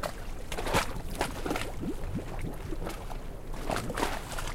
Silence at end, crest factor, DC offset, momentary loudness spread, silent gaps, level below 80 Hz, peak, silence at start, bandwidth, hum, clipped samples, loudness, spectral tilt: 0 s; 20 dB; under 0.1%; 11 LU; none; -38 dBFS; -14 dBFS; 0 s; 16.5 kHz; none; under 0.1%; -35 LUFS; -4.5 dB/octave